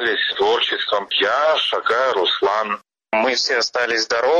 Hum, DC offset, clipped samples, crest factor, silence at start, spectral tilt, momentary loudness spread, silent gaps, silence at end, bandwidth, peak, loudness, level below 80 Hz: none; under 0.1%; under 0.1%; 14 dB; 0 s; -1 dB/octave; 4 LU; none; 0 s; 10 kHz; -6 dBFS; -18 LUFS; -62 dBFS